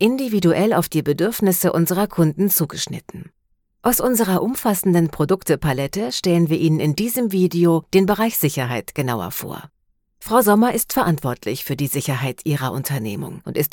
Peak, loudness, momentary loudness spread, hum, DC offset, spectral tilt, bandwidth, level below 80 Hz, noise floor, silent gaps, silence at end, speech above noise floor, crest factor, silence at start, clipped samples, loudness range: -2 dBFS; -19 LUFS; 10 LU; none; under 0.1%; -5.5 dB/octave; 18 kHz; -50 dBFS; -55 dBFS; none; 0.05 s; 36 dB; 16 dB; 0 s; under 0.1%; 2 LU